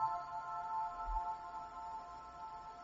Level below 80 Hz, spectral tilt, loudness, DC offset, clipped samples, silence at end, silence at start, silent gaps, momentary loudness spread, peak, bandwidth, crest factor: -54 dBFS; -3.5 dB/octave; -44 LUFS; under 0.1%; under 0.1%; 0 s; 0 s; none; 9 LU; -26 dBFS; 7.6 kHz; 18 dB